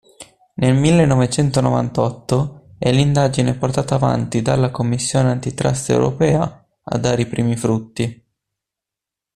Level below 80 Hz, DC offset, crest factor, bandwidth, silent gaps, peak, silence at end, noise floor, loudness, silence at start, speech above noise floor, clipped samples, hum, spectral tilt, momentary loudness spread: -44 dBFS; under 0.1%; 16 dB; 12 kHz; none; -2 dBFS; 1.2 s; -86 dBFS; -18 LUFS; 0.2 s; 69 dB; under 0.1%; none; -6 dB/octave; 7 LU